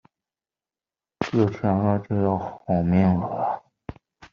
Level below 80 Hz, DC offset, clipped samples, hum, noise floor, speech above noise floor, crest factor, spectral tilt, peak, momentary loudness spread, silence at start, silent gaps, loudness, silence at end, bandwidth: -54 dBFS; under 0.1%; under 0.1%; none; under -90 dBFS; over 68 dB; 18 dB; -8.5 dB/octave; -6 dBFS; 14 LU; 1.2 s; none; -24 LUFS; 0.05 s; 6.8 kHz